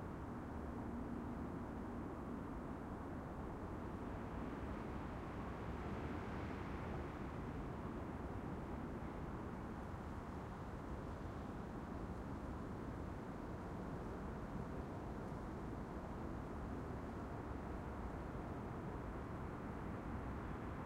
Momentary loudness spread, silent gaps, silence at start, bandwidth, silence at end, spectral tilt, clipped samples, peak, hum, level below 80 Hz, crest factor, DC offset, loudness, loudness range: 2 LU; none; 0 s; 16 kHz; 0 s; -8 dB/octave; under 0.1%; -34 dBFS; none; -54 dBFS; 14 dB; under 0.1%; -48 LUFS; 2 LU